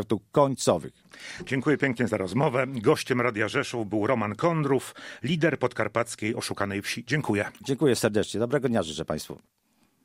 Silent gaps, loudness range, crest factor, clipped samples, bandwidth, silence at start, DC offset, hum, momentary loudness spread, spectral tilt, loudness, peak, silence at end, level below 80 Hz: none; 2 LU; 20 dB; under 0.1%; 16 kHz; 0 s; under 0.1%; none; 9 LU; -5.5 dB/octave; -26 LUFS; -6 dBFS; 0.65 s; -60 dBFS